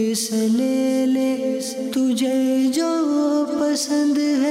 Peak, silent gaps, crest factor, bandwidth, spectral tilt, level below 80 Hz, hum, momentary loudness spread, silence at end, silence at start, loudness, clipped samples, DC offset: -12 dBFS; none; 8 dB; 16 kHz; -4 dB/octave; -72 dBFS; none; 3 LU; 0 s; 0 s; -20 LUFS; under 0.1%; under 0.1%